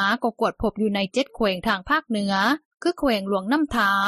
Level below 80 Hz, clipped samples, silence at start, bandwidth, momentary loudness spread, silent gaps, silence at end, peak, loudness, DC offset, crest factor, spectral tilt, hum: -48 dBFS; under 0.1%; 0 s; 14 kHz; 4 LU; 2.65-2.78 s; 0 s; -8 dBFS; -23 LUFS; under 0.1%; 16 dB; -5 dB/octave; none